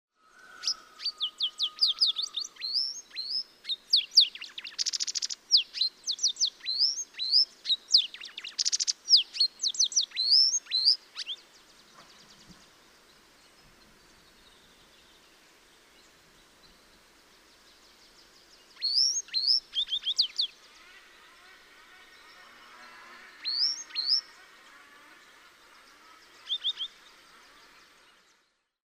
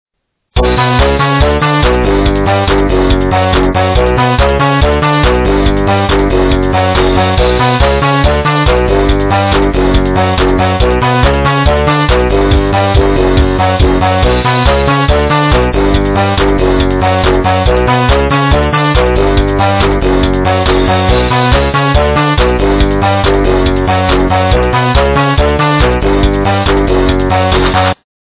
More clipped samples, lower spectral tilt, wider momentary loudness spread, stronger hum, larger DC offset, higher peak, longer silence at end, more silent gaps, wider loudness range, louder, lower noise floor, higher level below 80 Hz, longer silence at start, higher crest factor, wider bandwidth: neither; second, 4 dB/octave vs -10.5 dB/octave; first, 15 LU vs 1 LU; neither; neither; second, -8 dBFS vs 0 dBFS; first, 2.1 s vs 0.4 s; neither; first, 14 LU vs 0 LU; second, -26 LUFS vs -10 LUFS; first, -72 dBFS vs -58 dBFS; second, -76 dBFS vs -16 dBFS; about the same, 0.5 s vs 0.55 s; first, 24 dB vs 8 dB; first, 15.5 kHz vs 4 kHz